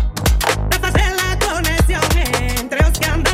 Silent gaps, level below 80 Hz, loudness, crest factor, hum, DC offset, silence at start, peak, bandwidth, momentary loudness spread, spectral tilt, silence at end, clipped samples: none; -18 dBFS; -17 LUFS; 14 dB; none; under 0.1%; 0 s; -2 dBFS; 16.5 kHz; 2 LU; -4 dB/octave; 0 s; under 0.1%